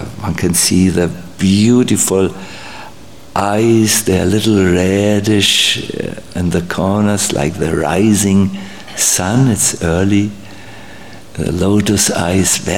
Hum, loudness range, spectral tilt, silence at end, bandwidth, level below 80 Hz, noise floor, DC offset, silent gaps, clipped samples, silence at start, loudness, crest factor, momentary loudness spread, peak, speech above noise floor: none; 3 LU; -4 dB/octave; 0 s; 17 kHz; -38 dBFS; -37 dBFS; 2%; none; under 0.1%; 0 s; -13 LUFS; 14 dB; 16 LU; 0 dBFS; 24 dB